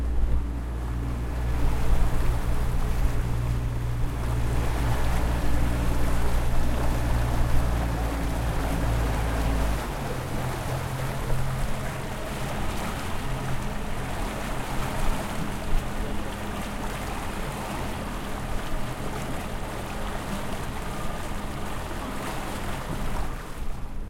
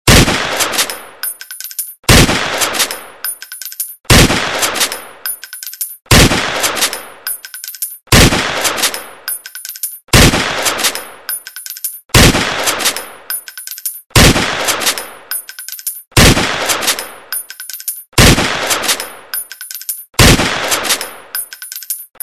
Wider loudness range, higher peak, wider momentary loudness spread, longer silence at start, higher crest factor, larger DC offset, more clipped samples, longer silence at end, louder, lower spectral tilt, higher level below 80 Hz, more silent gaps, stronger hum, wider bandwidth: about the same, 5 LU vs 3 LU; second, -8 dBFS vs 0 dBFS; second, 6 LU vs 15 LU; about the same, 0 s vs 0.05 s; about the same, 16 dB vs 14 dB; neither; second, under 0.1% vs 0.5%; second, 0 s vs 0.2 s; second, -30 LUFS vs -13 LUFS; first, -5.5 dB/octave vs -3 dB/octave; about the same, -28 dBFS vs -24 dBFS; second, none vs 14.06-14.10 s; neither; second, 16.5 kHz vs over 20 kHz